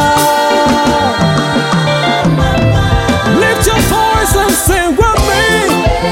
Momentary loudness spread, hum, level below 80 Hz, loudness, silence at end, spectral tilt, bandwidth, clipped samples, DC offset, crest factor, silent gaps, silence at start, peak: 2 LU; none; -22 dBFS; -10 LUFS; 0 s; -4.5 dB/octave; 17 kHz; under 0.1%; 0.2%; 10 dB; none; 0 s; 0 dBFS